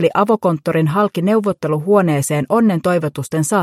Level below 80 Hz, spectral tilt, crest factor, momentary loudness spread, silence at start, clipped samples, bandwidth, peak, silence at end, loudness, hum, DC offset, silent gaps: -58 dBFS; -6.5 dB/octave; 14 dB; 5 LU; 0 s; under 0.1%; 15.5 kHz; -2 dBFS; 0 s; -16 LUFS; none; under 0.1%; none